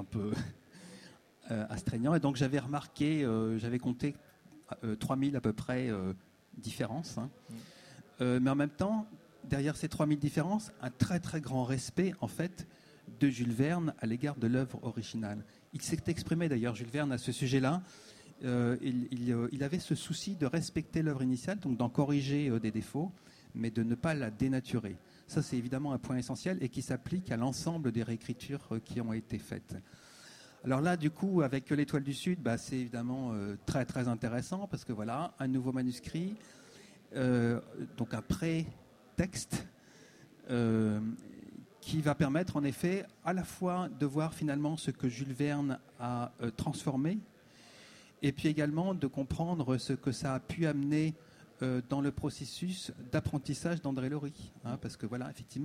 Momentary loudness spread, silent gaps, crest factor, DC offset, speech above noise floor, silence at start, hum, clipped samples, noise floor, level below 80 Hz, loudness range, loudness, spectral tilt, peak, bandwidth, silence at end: 13 LU; none; 20 dB; under 0.1%; 24 dB; 0 s; none; under 0.1%; -59 dBFS; -60 dBFS; 3 LU; -35 LUFS; -6.5 dB/octave; -16 dBFS; 15.5 kHz; 0 s